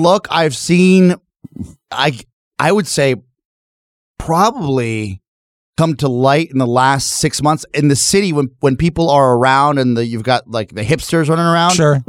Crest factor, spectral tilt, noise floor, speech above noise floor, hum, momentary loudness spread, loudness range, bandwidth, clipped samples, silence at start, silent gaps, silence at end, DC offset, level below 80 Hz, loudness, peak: 14 dB; -5 dB/octave; under -90 dBFS; over 77 dB; none; 13 LU; 5 LU; 16 kHz; under 0.1%; 0 s; 2.33-2.51 s, 3.45-4.15 s, 5.28-5.73 s; 0.05 s; under 0.1%; -42 dBFS; -14 LUFS; 0 dBFS